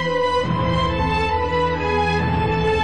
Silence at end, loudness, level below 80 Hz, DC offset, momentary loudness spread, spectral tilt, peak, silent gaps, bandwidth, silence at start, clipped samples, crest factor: 0 s; -20 LUFS; -32 dBFS; 1%; 1 LU; -6.5 dB/octave; -8 dBFS; none; 10 kHz; 0 s; under 0.1%; 12 dB